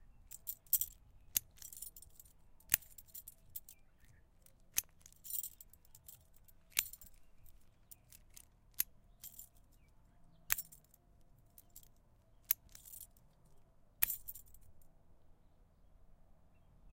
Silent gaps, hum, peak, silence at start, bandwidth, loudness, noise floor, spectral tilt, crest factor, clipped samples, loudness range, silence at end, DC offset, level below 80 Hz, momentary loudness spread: none; none; -8 dBFS; 0 s; 17 kHz; -40 LUFS; -66 dBFS; 1 dB/octave; 40 dB; under 0.1%; 7 LU; 0 s; under 0.1%; -66 dBFS; 25 LU